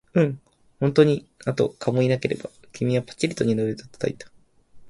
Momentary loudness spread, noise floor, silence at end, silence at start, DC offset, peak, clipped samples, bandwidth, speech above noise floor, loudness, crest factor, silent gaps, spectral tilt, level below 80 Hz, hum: 11 LU; -49 dBFS; 0 s; 0.15 s; under 0.1%; -2 dBFS; under 0.1%; 11.5 kHz; 26 dB; -24 LUFS; 22 dB; none; -7 dB/octave; -58 dBFS; none